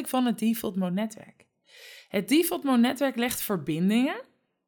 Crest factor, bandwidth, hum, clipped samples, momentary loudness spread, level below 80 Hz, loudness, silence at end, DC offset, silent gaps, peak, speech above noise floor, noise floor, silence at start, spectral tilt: 16 dB; 19.5 kHz; none; under 0.1%; 13 LU; -66 dBFS; -26 LUFS; 0.45 s; under 0.1%; none; -12 dBFS; 25 dB; -51 dBFS; 0 s; -5 dB/octave